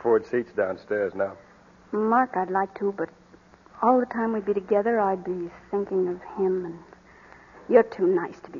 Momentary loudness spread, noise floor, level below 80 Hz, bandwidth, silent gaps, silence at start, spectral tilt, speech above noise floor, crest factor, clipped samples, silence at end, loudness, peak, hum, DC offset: 11 LU; -53 dBFS; -64 dBFS; 7 kHz; none; 0 s; -8.5 dB/octave; 29 dB; 20 dB; under 0.1%; 0 s; -25 LUFS; -4 dBFS; none; under 0.1%